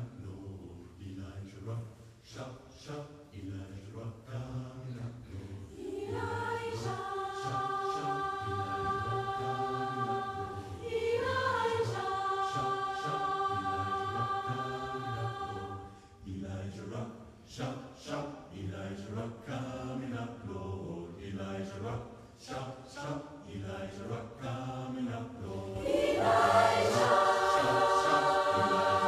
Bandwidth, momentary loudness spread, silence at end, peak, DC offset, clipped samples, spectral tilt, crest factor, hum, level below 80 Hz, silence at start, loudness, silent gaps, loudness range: 15.5 kHz; 18 LU; 0 s; -14 dBFS; under 0.1%; under 0.1%; -5 dB/octave; 20 dB; none; -60 dBFS; 0 s; -34 LUFS; none; 15 LU